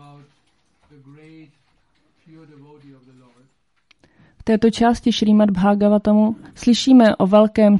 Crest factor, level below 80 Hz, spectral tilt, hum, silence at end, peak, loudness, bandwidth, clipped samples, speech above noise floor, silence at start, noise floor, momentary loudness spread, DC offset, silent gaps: 16 dB; -48 dBFS; -6.5 dB/octave; none; 0 s; -2 dBFS; -16 LUFS; 11 kHz; under 0.1%; 47 dB; 4.45 s; -64 dBFS; 8 LU; under 0.1%; none